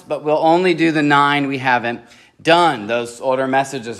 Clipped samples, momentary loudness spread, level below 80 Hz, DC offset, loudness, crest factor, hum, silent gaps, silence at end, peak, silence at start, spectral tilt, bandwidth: under 0.1%; 8 LU; -66 dBFS; under 0.1%; -16 LUFS; 16 dB; none; none; 0 s; 0 dBFS; 0.1 s; -5 dB/octave; 12.5 kHz